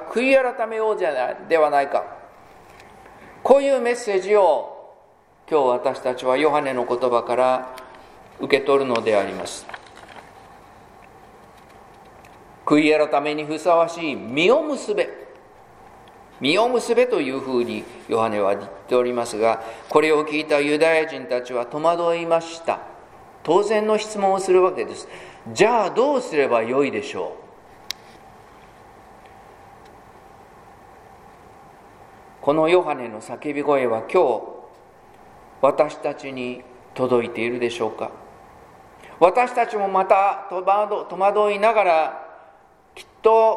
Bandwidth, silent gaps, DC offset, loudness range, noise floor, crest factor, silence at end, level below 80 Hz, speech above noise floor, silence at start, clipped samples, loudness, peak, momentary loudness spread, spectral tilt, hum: 15 kHz; none; under 0.1%; 5 LU; -53 dBFS; 22 dB; 0 s; -62 dBFS; 34 dB; 0 s; under 0.1%; -20 LUFS; 0 dBFS; 15 LU; -4.5 dB/octave; none